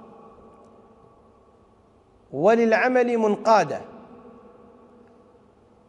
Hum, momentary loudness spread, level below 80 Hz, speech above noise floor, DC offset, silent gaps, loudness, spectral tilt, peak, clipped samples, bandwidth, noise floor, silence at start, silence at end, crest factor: none; 16 LU; -66 dBFS; 37 dB; under 0.1%; none; -20 LUFS; -5.5 dB/octave; -6 dBFS; under 0.1%; 10 kHz; -57 dBFS; 2.3 s; 1.9 s; 20 dB